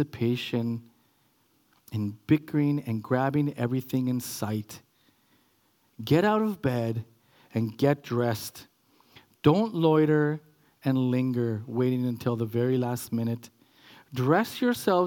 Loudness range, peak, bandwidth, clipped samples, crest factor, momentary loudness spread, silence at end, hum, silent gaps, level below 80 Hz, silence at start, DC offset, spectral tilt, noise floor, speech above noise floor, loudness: 4 LU; -6 dBFS; 18 kHz; under 0.1%; 20 dB; 11 LU; 0 s; none; none; -68 dBFS; 0 s; under 0.1%; -7 dB/octave; -67 dBFS; 41 dB; -27 LUFS